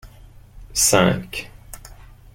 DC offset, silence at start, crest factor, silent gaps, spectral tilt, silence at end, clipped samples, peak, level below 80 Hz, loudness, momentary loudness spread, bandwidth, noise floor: under 0.1%; 0.05 s; 22 dB; none; -3 dB/octave; 0.4 s; under 0.1%; -2 dBFS; -42 dBFS; -18 LUFS; 25 LU; 16.5 kHz; -45 dBFS